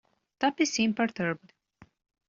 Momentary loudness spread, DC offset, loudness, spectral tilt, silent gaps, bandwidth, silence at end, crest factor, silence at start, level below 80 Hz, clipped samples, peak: 7 LU; under 0.1%; -28 LUFS; -3 dB/octave; none; 7.6 kHz; 0.9 s; 20 dB; 0.4 s; -70 dBFS; under 0.1%; -12 dBFS